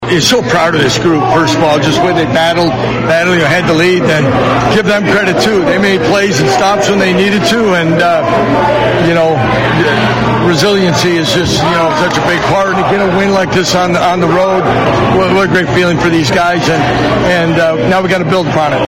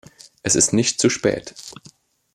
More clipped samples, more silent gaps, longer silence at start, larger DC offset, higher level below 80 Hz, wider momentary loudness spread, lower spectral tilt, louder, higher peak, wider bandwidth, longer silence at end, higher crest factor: neither; neither; second, 0 s vs 0.45 s; neither; first, -34 dBFS vs -54 dBFS; second, 2 LU vs 21 LU; first, -5 dB/octave vs -3 dB/octave; first, -9 LUFS vs -19 LUFS; first, 0 dBFS vs -4 dBFS; first, 16.5 kHz vs 14.5 kHz; second, 0 s vs 0.65 s; second, 10 dB vs 18 dB